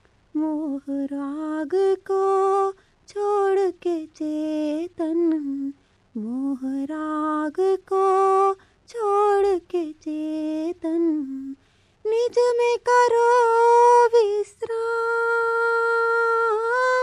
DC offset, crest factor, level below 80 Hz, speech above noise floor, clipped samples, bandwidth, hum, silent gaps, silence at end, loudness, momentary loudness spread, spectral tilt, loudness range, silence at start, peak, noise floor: under 0.1%; 14 dB; -66 dBFS; 38 dB; under 0.1%; 11 kHz; none; none; 0 s; -22 LUFS; 12 LU; -4 dB/octave; 7 LU; 0.35 s; -8 dBFS; -60 dBFS